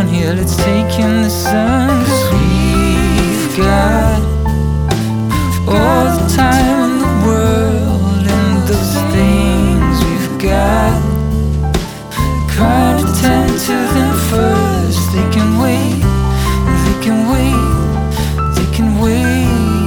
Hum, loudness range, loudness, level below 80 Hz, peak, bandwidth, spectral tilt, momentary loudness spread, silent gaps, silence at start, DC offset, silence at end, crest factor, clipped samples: none; 1 LU; -13 LUFS; -20 dBFS; 0 dBFS; over 20 kHz; -6 dB/octave; 4 LU; none; 0 s; under 0.1%; 0 s; 12 dB; under 0.1%